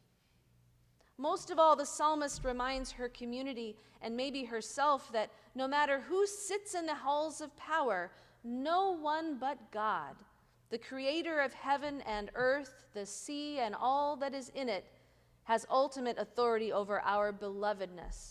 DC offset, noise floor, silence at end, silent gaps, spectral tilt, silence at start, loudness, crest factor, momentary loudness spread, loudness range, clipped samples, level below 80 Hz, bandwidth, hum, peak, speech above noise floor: under 0.1%; -71 dBFS; 0 s; none; -3 dB/octave; 1.2 s; -35 LUFS; 20 dB; 11 LU; 3 LU; under 0.1%; -60 dBFS; 14.5 kHz; none; -16 dBFS; 35 dB